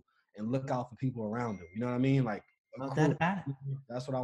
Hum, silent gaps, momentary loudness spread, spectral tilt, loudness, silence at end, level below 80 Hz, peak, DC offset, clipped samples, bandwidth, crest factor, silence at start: none; 2.58-2.65 s; 12 LU; -8 dB/octave; -34 LUFS; 0 s; -68 dBFS; -14 dBFS; under 0.1%; under 0.1%; 8.6 kHz; 20 dB; 0.35 s